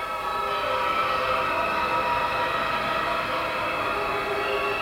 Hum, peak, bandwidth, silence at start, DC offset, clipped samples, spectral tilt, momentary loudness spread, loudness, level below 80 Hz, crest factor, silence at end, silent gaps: none; -12 dBFS; 16.5 kHz; 0 s; under 0.1%; under 0.1%; -4 dB/octave; 2 LU; -25 LUFS; -50 dBFS; 12 dB; 0 s; none